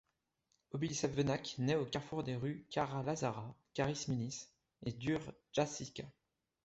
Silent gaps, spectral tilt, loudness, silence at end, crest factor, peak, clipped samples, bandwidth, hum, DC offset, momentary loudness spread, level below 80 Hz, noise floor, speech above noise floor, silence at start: none; -5.5 dB/octave; -40 LUFS; 0.55 s; 18 dB; -22 dBFS; under 0.1%; 8 kHz; none; under 0.1%; 11 LU; -66 dBFS; -83 dBFS; 44 dB; 0.75 s